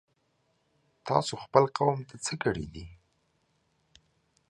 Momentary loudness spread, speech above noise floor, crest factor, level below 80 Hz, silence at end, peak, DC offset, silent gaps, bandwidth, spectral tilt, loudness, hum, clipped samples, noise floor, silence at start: 17 LU; 45 dB; 28 dB; -58 dBFS; 1.55 s; -4 dBFS; under 0.1%; none; 11.5 kHz; -5 dB/octave; -29 LUFS; none; under 0.1%; -73 dBFS; 1.05 s